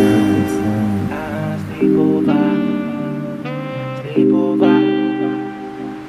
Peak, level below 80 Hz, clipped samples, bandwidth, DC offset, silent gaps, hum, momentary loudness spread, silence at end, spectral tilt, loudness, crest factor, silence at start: 0 dBFS; -50 dBFS; under 0.1%; 14 kHz; under 0.1%; none; none; 11 LU; 0 s; -7.5 dB/octave; -17 LUFS; 16 dB; 0 s